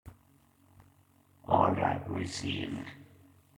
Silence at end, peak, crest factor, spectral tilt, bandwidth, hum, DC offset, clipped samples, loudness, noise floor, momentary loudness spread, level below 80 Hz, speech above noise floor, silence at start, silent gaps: 0.55 s; -10 dBFS; 24 dB; -5.5 dB/octave; 17.5 kHz; none; under 0.1%; under 0.1%; -31 LUFS; -65 dBFS; 21 LU; -62 dBFS; 34 dB; 0.05 s; none